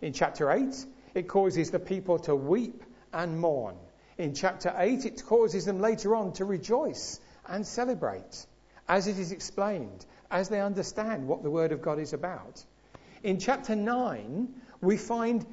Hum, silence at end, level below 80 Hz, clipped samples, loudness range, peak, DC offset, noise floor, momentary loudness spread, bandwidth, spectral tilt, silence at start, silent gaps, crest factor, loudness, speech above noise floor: none; 0 s; -60 dBFS; under 0.1%; 4 LU; -10 dBFS; under 0.1%; -54 dBFS; 12 LU; 8 kHz; -5.5 dB/octave; 0 s; none; 20 dB; -30 LUFS; 25 dB